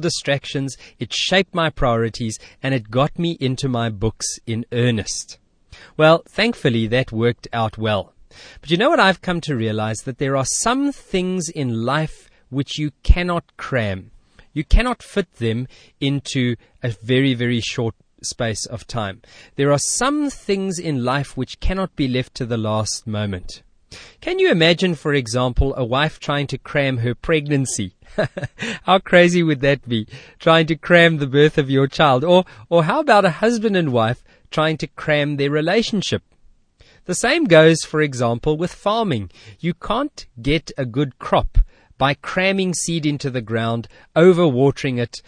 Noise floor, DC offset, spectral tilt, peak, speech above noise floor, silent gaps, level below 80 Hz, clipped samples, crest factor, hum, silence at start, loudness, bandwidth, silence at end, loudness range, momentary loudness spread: -52 dBFS; under 0.1%; -5 dB/octave; 0 dBFS; 34 dB; none; -32 dBFS; under 0.1%; 20 dB; none; 0 s; -19 LUFS; 10.5 kHz; 0.1 s; 7 LU; 12 LU